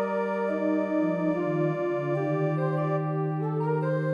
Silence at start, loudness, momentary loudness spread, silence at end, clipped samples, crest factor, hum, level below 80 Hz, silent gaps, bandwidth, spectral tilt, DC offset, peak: 0 s; -27 LUFS; 2 LU; 0 s; under 0.1%; 12 dB; none; -74 dBFS; none; 6.8 kHz; -10 dB/octave; under 0.1%; -16 dBFS